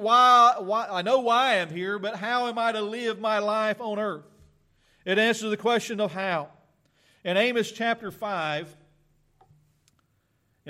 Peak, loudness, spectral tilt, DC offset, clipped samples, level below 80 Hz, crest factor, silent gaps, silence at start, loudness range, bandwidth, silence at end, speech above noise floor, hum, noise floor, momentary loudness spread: -8 dBFS; -24 LUFS; -4 dB/octave; under 0.1%; under 0.1%; -72 dBFS; 18 dB; none; 0 s; 6 LU; 15 kHz; 0 s; 46 dB; none; -70 dBFS; 12 LU